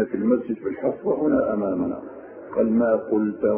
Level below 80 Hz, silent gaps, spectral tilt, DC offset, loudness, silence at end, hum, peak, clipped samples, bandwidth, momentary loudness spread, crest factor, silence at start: -56 dBFS; none; -13 dB/octave; under 0.1%; -23 LUFS; 0 s; none; -8 dBFS; under 0.1%; 3.1 kHz; 9 LU; 14 dB; 0 s